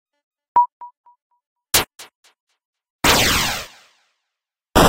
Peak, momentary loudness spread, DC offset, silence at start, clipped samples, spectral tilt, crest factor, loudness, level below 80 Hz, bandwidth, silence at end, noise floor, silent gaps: -2 dBFS; 14 LU; under 0.1%; 0.55 s; under 0.1%; -2.5 dB/octave; 20 dB; -18 LUFS; -36 dBFS; 16 kHz; 0 s; -83 dBFS; 0.72-0.80 s, 0.97-1.04 s, 1.22-1.30 s, 1.46-1.56 s, 2.15-2.23 s, 2.40-2.47 s, 2.65-2.73 s, 2.90-2.99 s